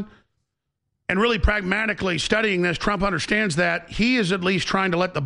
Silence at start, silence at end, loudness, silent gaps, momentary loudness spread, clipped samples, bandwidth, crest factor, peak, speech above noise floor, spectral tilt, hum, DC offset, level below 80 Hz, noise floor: 0 s; 0 s; -21 LUFS; none; 3 LU; under 0.1%; 11 kHz; 16 dB; -6 dBFS; 57 dB; -5 dB/octave; none; under 0.1%; -34 dBFS; -79 dBFS